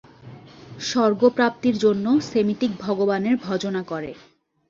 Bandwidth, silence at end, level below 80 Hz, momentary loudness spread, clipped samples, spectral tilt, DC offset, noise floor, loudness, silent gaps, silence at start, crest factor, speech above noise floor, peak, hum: 7.6 kHz; 0.55 s; -60 dBFS; 11 LU; under 0.1%; -5.5 dB/octave; under 0.1%; -44 dBFS; -22 LUFS; none; 0.25 s; 16 dB; 23 dB; -6 dBFS; none